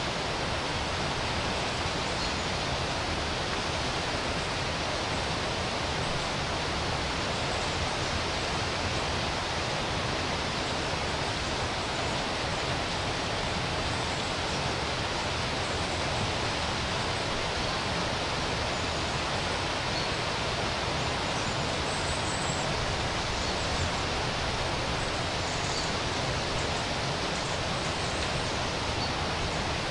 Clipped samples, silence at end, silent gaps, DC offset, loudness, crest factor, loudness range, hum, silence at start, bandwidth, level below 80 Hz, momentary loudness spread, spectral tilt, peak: under 0.1%; 0 s; none; under 0.1%; -29 LUFS; 14 dB; 1 LU; none; 0 s; 11.5 kHz; -42 dBFS; 1 LU; -3.5 dB/octave; -16 dBFS